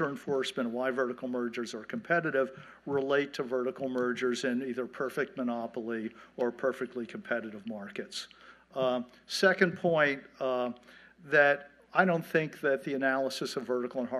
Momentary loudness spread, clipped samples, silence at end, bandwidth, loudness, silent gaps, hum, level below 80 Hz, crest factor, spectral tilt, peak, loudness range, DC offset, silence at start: 12 LU; under 0.1%; 0 s; 13.5 kHz; -31 LUFS; none; none; -76 dBFS; 22 dB; -5 dB/octave; -10 dBFS; 7 LU; under 0.1%; 0 s